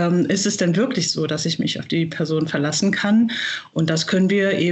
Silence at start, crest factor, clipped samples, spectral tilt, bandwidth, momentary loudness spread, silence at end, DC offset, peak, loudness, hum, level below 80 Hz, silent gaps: 0 s; 14 dB; under 0.1%; -4.5 dB/octave; 8.4 kHz; 5 LU; 0 s; under 0.1%; -6 dBFS; -20 LUFS; none; -64 dBFS; none